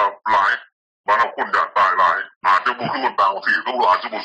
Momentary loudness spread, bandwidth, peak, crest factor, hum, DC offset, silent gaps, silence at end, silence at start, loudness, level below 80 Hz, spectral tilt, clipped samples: 5 LU; 9.2 kHz; -6 dBFS; 14 dB; none; under 0.1%; 0.72-1.04 s, 2.36-2.41 s; 0 s; 0 s; -18 LUFS; -62 dBFS; -3.5 dB/octave; under 0.1%